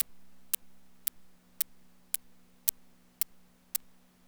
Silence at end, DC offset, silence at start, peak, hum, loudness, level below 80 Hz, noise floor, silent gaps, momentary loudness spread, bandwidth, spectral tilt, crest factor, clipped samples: 0.45 s; under 0.1%; 0.1 s; 0 dBFS; none; -35 LUFS; -70 dBFS; -58 dBFS; none; 5 LU; over 20 kHz; 1 dB/octave; 40 dB; under 0.1%